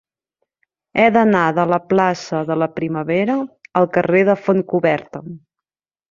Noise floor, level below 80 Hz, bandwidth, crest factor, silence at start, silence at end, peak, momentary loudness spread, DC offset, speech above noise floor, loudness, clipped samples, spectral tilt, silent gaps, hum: -86 dBFS; -58 dBFS; 7.4 kHz; 16 dB; 0.95 s; 0.75 s; -2 dBFS; 9 LU; under 0.1%; 70 dB; -17 LUFS; under 0.1%; -7 dB/octave; none; none